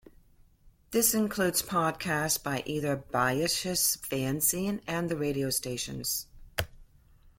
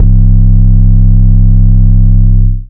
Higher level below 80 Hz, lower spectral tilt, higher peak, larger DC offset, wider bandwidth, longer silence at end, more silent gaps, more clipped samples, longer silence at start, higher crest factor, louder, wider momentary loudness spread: second, -54 dBFS vs -6 dBFS; second, -3 dB/octave vs -14 dB/octave; second, -10 dBFS vs 0 dBFS; neither; first, 16.5 kHz vs 0.9 kHz; about the same, 0.1 s vs 0.05 s; neither; second, under 0.1% vs 20%; first, 0.65 s vs 0 s; first, 20 dB vs 4 dB; second, -29 LUFS vs -8 LUFS; first, 8 LU vs 1 LU